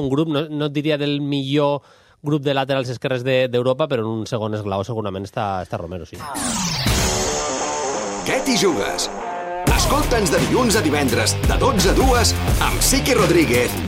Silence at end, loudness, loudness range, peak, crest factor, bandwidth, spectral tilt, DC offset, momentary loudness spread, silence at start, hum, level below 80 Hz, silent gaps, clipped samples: 0 s; -19 LUFS; 6 LU; -4 dBFS; 14 dB; 16 kHz; -4 dB/octave; under 0.1%; 10 LU; 0 s; none; -30 dBFS; none; under 0.1%